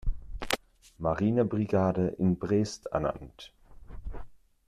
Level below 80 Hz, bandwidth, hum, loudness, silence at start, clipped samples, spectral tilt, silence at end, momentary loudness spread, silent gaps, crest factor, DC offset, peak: -42 dBFS; 14 kHz; none; -29 LUFS; 0.05 s; under 0.1%; -6.5 dB/octave; 0.3 s; 20 LU; none; 24 dB; under 0.1%; -6 dBFS